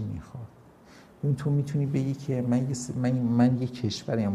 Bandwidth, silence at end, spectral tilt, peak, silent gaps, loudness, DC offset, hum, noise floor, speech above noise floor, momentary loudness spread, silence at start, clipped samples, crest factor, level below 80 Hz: 11.5 kHz; 0 s; -7 dB/octave; -10 dBFS; none; -27 LUFS; under 0.1%; none; -53 dBFS; 27 dB; 15 LU; 0 s; under 0.1%; 16 dB; -58 dBFS